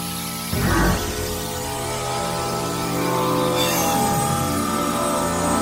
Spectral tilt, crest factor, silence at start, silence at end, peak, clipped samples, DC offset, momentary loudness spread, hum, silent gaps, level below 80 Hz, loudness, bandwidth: -4 dB/octave; 16 dB; 0 s; 0 s; -6 dBFS; under 0.1%; under 0.1%; 7 LU; none; none; -36 dBFS; -22 LUFS; 16.5 kHz